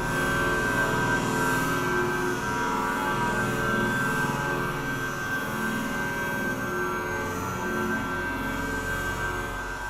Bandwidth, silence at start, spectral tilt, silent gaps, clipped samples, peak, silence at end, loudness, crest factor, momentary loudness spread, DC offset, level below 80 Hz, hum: 16 kHz; 0 s; -4.5 dB/octave; none; under 0.1%; -12 dBFS; 0 s; -27 LUFS; 14 dB; 5 LU; under 0.1%; -44 dBFS; 60 Hz at -45 dBFS